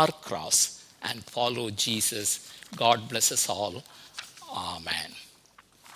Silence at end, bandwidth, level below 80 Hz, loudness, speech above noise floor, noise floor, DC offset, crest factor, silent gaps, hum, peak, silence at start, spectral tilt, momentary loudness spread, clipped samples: 0 s; 16 kHz; -64 dBFS; -27 LUFS; 30 dB; -58 dBFS; under 0.1%; 22 dB; none; none; -8 dBFS; 0 s; -1.5 dB/octave; 19 LU; under 0.1%